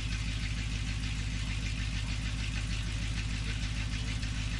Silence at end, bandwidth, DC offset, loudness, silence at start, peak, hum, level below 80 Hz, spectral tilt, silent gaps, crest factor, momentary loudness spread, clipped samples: 0 s; 11.5 kHz; under 0.1%; -35 LUFS; 0 s; -20 dBFS; none; -36 dBFS; -4 dB/octave; none; 12 dB; 0 LU; under 0.1%